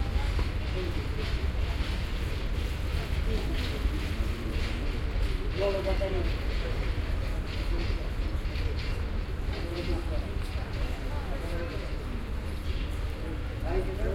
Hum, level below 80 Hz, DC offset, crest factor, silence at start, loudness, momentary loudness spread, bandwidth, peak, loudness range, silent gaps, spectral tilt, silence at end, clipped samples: none; -32 dBFS; under 0.1%; 14 dB; 0 s; -33 LUFS; 5 LU; 15.5 kHz; -16 dBFS; 3 LU; none; -6.5 dB/octave; 0 s; under 0.1%